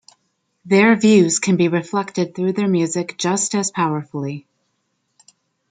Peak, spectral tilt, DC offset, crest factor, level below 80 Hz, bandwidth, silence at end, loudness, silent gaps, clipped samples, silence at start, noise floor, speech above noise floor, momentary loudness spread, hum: -2 dBFS; -5 dB/octave; under 0.1%; 18 dB; -64 dBFS; 9.6 kHz; 1.3 s; -18 LUFS; none; under 0.1%; 0.65 s; -70 dBFS; 53 dB; 12 LU; none